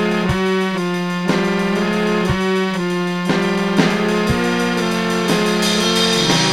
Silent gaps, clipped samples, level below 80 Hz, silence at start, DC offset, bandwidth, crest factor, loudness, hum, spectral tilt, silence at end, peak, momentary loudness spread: none; under 0.1%; -40 dBFS; 0 s; under 0.1%; 16 kHz; 16 dB; -17 LUFS; none; -4.5 dB/octave; 0 s; 0 dBFS; 5 LU